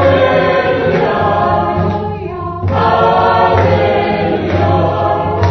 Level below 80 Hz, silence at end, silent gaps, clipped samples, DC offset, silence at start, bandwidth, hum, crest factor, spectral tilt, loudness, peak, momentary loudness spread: -36 dBFS; 0 s; none; under 0.1%; under 0.1%; 0 s; 6.2 kHz; none; 12 dB; -8 dB/octave; -12 LUFS; 0 dBFS; 7 LU